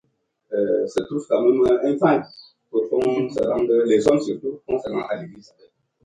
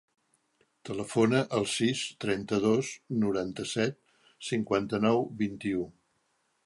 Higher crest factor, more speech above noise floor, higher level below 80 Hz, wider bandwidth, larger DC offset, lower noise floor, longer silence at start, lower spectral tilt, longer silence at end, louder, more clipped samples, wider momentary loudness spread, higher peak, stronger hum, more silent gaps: about the same, 18 dB vs 20 dB; second, 39 dB vs 45 dB; first, -58 dBFS vs -64 dBFS; about the same, 10.5 kHz vs 11.5 kHz; neither; second, -60 dBFS vs -74 dBFS; second, 0.5 s vs 0.85 s; first, -6.5 dB/octave vs -5 dB/octave; about the same, 0.65 s vs 0.75 s; first, -21 LUFS vs -30 LUFS; neither; about the same, 11 LU vs 9 LU; first, -4 dBFS vs -12 dBFS; neither; neither